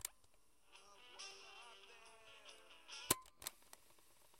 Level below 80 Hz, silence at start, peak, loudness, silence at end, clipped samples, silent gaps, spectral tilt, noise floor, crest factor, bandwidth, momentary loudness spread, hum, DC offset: -76 dBFS; 0 s; -16 dBFS; -46 LUFS; 0 s; under 0.1%; none; -1 dB/octave; -75 dBFS; 36 dB; 16 kHz; 24 LU; none; under 0.1%